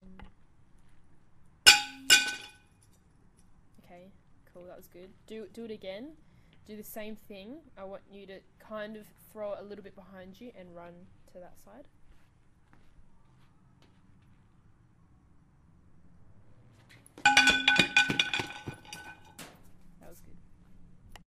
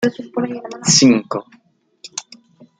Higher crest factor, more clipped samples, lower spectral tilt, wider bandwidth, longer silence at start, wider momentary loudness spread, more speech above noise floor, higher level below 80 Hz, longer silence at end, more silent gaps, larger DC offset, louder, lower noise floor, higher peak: first, 32 dB vs 20 dB; neither; second, -0.5 dB/octave vs -3.5 dB/octave; first, 15.5 kHz vs 9.6 kHz; about the same, 0.1 s vs 0 s; first, 29 LU vs 19 LU; second, 17 dB vs 29 dB; about the same, -60 dBFS vs -60 dBFS; second, 0.15 s vs 0.6 s; neither; neither; second, -24 LUFS vs -16 LUFS; first, -62 dBFS vs -46 dBFS; about the same, -2 dBFS vs 0 dBFS